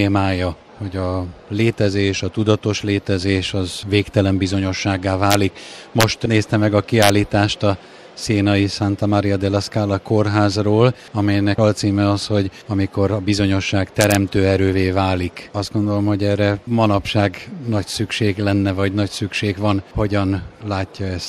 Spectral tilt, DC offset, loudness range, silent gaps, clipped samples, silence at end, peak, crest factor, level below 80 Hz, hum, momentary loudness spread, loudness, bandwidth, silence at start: -6 dB/octave; under 0.1%; 3 LU; none; under 0.1%; 0 s; 0 dBFS; 18 dB; -44 dBFS; none; 8 LU; -18 LUFS; 13.5 kHz; 0 s